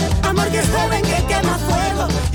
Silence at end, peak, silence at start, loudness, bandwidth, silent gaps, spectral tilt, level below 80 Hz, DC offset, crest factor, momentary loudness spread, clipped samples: 0 s; -6 dBFS; 0 s; -18 LUFS; 19.5 kHz; none; -5 dB/octave; -26 dBFS; under 0.1%; 10 dB; 1 LU; under 0.1%